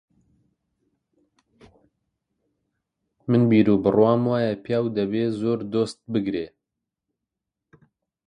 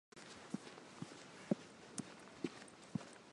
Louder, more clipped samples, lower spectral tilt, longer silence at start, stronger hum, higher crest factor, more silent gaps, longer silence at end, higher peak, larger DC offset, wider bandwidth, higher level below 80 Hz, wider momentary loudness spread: first, -22 LUFS vs -49 LUFS; neither; first, -8.5 dB/octave vs -5 dB/octave; first, 3.3 s vs 0.15 s; neither; second, 20 dB vs 28 dB; neither; first, 1.8 s vs 0 s; first, -4 dBFS vs -20 dBFS; neither; about the same, 10.5 kHz vs 11.5 kHz; first, -60 dBFS vs -82 dBFS; about the same, 10 LU vs 12 LU